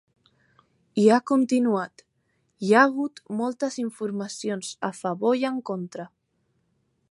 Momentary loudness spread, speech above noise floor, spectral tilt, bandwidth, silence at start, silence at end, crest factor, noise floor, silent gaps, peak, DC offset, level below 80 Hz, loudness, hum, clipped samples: 14 LU; 48 dB; -5.5 dB/octave; 11.5 kHz; 0.95 s; 1.05 s; 22 dB; -72 dBFS; none; -4 dBFS; under 0.1%; -76 dBFS; -24 LUFS; none; under 0.1%